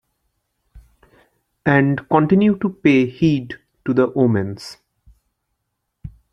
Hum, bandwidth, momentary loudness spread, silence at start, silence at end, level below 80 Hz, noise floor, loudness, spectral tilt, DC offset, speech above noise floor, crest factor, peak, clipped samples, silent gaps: none; 10.5 kHz; 14 LU; 0.75 s; 0.25 s; -50 dBFS; -75 dBFS; -17 LUFS; -8 dB/octave; under 0.1%; 59 dB; 20 dB; 0 dBFS; under 0.1%; none